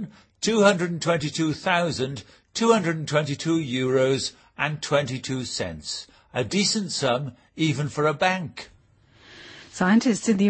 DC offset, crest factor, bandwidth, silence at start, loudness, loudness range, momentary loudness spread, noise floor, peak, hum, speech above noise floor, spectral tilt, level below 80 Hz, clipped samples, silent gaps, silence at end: under 0.1%; 20 dB; 8.8 kHz; 0 s; -24 LUFS; 3 LU; 13 LU; -57 dBFS; -4 dBFS; none; 33 dB; -4.5 dB/octave; -58 dBFS; under 0.1%; none; 0 s